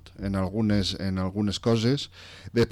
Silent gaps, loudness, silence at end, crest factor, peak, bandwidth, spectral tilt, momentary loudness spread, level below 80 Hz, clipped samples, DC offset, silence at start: none; -27 LUFS; 0 s; 12 dB; -14 dBFS; 13.5 kHz; -6 dB/octave; 7 LU; -46 dBFS; under 0.1%; under 0.1%; 0.05 s